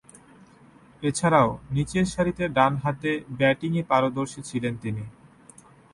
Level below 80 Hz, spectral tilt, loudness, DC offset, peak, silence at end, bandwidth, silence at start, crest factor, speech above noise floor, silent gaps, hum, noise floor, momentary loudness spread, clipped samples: -52 dBFS; -6 dB/octave; -25 LUFS; under 0.1%; -6 dBFS; 0.85 s; 11.5 kHz; 1 s; 20 dB; 29 dB; none; none; -53 dBFS; 10 LU; under 0.1%